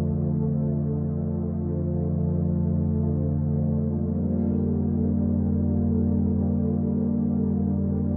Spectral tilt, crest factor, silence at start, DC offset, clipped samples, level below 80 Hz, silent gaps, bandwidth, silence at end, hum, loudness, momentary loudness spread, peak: -13.5 dB/octave; 10 dB; 0 s; under 0.1%; under 0.1%; -40 dBFS; none; 1.9 kHz; 0 s; none; -25 LUFS; 3 LU; -12 dBFS